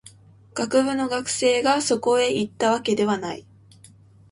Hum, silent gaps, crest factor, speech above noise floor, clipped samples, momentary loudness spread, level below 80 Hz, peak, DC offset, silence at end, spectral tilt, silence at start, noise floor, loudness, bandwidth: none; none; 16 dB; 29 dB; under 0.1%; 9 LU; -62 dBFS; -8 dBFS; under 0.1%; 0.9 s; -3.5 dB/octave; 0.05 s; -51 dBFS; -22 LUFS; 11.5 kHz